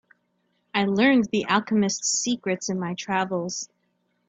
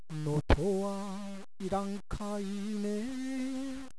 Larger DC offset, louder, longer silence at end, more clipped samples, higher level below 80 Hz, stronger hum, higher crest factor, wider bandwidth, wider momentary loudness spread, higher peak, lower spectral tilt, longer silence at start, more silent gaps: second, under 0.1% vs 0.6%; first, -24 LUFS vs -35 LUFS; first, 0.65 s vs 0 s; neither; second, -66 dBFS vs -42 dBFS; first, 60 Hz at -50 dBFS vs none; second, 20 dB vs 26 dB; second, 9.2 kHz vs 11 kHz; about the same, 10 LU vs 10 LU; about the same, -6 dBFS vs -8 dBFS; second, -3.5 dB/octave vs -6.5 dB/octave; first, 0.75 s vs 0 s; neither